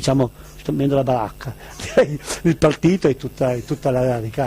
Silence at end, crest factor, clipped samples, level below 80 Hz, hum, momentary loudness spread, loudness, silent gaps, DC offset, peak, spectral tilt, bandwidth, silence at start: 0 s; 14 dB; under 0.1%; -42 dBFS; none; 11 LU; -20 LUFS; none; under 0.1%; -6 dBFS; -6.5 dB/octave; 15.5 kHz; 0 s